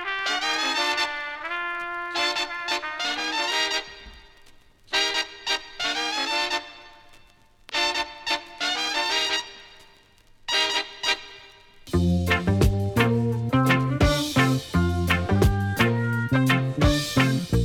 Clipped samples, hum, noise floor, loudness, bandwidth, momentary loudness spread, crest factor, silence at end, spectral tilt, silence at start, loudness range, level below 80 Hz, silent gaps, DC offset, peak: under 0.1%; none; -55 dBFS; -24 LUFS; 17.5 kHz; 7 LU; 14 dB; 0 s; -4.5 dB/octave; 0 s; 5 LU; -38 dBFS; none; under 0.1%; -10 dBFS